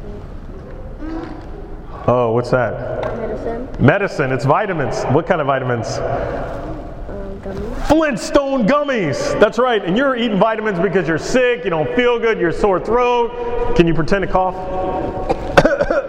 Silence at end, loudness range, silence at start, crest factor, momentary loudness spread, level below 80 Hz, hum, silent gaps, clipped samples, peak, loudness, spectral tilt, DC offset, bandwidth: 0 s; 4 LU; 0 s; 16 dB; 15 LU; -32 dBFS; none; none; under 0.1%; 0 dBFS; -17 LUFS; -6 dB/octave; under 0.1%; 12.5 kHz